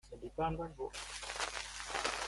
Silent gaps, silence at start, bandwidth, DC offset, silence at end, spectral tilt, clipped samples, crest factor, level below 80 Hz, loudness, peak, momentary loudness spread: none; 0.05 s; 12 kHz; under 0.1%; 0 s; -2.5 dB/octave; under 0.1%; 22 dB; -56 dBFS; -41 LUFS; -20 dBFS; 6 LU